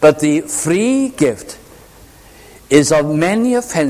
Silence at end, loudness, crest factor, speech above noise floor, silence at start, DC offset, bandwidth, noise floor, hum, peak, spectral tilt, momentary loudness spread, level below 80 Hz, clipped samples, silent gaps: 0 s; -14 LUFS; 14 dB; 28 dB; 0 s; under 0.1%; 15.5 kHz; -42 dBFS; none; 0 dBFS; -5 dB/octave; 11 LU; -48 dBFS; 0.1%; none